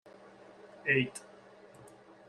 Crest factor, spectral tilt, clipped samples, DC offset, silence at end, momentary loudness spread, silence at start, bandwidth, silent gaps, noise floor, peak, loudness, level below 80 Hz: 24 dB; -5 dB/octave; under 0.1%; under 0.1%; 0.4 s; 26 LU; 0.65 s; 12.5 kHz; none; -56 dBFS; -14 dBFS; -31 LUFS; -74 dBFS